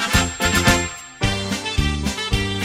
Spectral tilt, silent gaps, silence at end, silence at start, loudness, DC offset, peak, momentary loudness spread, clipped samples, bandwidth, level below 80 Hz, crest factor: -3.5 dB/octave; none; 0 s; 0 s; -20 LUFS; under 0.1%; 0 dBFS; 7 LU; under 0.1%; 16 kHz; -28 dBFS; 20 dB